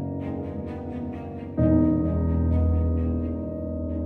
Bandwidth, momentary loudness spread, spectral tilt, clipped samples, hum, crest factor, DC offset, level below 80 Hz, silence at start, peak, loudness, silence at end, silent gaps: 3.1 kHz; 12 LU; -12.5 dB/octave; under 0.1%; none; 16 dB; under 0.1%; -32 dBFS; 0 s; -10 dBFS; -26 LUFS; 0 s; none